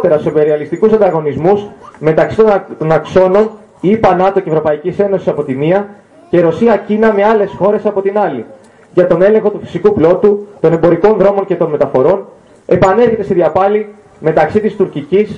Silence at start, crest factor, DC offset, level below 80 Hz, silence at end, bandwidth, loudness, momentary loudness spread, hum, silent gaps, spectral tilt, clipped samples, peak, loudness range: 0 s; 12 dB; under 0.1%; -44 dBFS; 0 s; 7.8 kHz; -11 LUFS; 7 LU; none; none; -8.5 dB/octave; under 0.1%; 0 dBFS; 2 LU